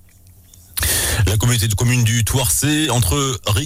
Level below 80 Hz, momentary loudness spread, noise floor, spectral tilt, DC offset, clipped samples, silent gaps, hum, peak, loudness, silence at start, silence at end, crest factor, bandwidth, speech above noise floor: -30 dBFS; 3 LU; -46 dBFS; -3.5 dB/octave; under 0.1%; under 0.1%; none; none; -6 dBFS; -16 LUFS; 0.75 s; 0 s; 10 dB; 16.5 kHz; 30 dB